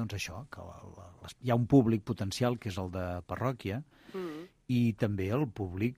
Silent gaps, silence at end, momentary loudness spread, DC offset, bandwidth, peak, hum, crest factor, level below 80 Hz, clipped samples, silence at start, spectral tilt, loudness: none; 0.05 s; 21 LU; under 0.1%; 15.5 kHz; -12 dBFS; none; 20 dB; -58 dBFS; under 0.1%; 0 s; -7 dB/octave; -32 LUFS